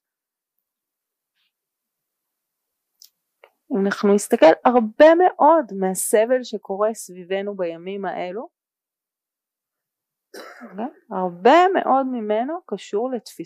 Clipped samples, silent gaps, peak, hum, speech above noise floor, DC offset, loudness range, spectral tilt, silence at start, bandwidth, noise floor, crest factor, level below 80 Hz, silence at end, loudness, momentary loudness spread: under 0.1%; none; -4 dBFS; none; 70 dB; under 0.1%; 16 LU; -4.5 dB/octave; 3.7 s; 15.5 kHz; -89 dBFS; 18 dB; -70 dBFS; 0 s; -19 LUFS; 17 LU